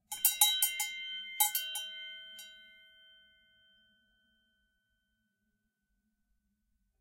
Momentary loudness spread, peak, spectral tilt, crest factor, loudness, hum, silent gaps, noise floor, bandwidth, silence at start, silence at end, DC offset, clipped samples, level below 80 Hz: 22 LU; -10 dBFS; 5 dB/octave; 30 dB; -30 LUFS; none; none; -82 dBFS; 16 kHz; 0.1 s; 4.3 s; under 0.1%; under 0.1%; -82 dBFS